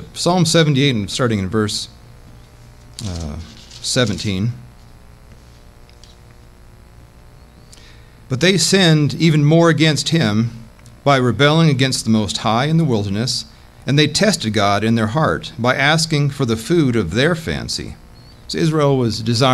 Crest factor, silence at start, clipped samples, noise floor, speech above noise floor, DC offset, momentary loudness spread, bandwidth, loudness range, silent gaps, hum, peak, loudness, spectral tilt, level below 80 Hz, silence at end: 16 dB; 0 s; under 0.1%; -43 dBFS; 27 dB; under 0.1%; 14 LU; 14 kHz; 9 LU; none; none; -2 dBFS; -16 LUFS; -5 dB/octave; -42 dBFS; 0 s